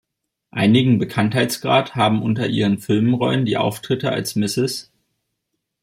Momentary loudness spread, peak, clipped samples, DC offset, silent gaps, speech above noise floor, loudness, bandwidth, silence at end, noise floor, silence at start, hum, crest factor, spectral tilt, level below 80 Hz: 6 LU; -4 dBFS; under 0.1%; under 0.1%; none; 58 dB; -19 LUFS; 16 kHz; 1 s; -77 dBFS; 0.55 s; none; 16 dB; -5.5 dB/octave; -58 dBFS